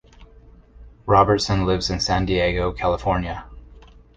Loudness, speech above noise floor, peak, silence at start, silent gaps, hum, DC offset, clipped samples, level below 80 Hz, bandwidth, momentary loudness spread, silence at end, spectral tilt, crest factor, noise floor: -20 LUFS; 28 dB; -2 dBFS; 0.2 s; none; none; under 0.1%; under 0.1%; -36 dBFS; 9.4 kHz; 11 LU; 0.35 s; -5.5 dB/octave; 20 dB; -48 dBFS